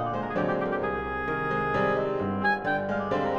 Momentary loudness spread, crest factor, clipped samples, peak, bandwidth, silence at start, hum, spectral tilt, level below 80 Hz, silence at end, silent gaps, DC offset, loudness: 4 LU; 14 dB; under 0.1%; -14 dBFS; 8 kHz; 0 s; none; -7.5 dB/octave; -50 dBFS; 0 s; none; 0.2%; -27 LUFS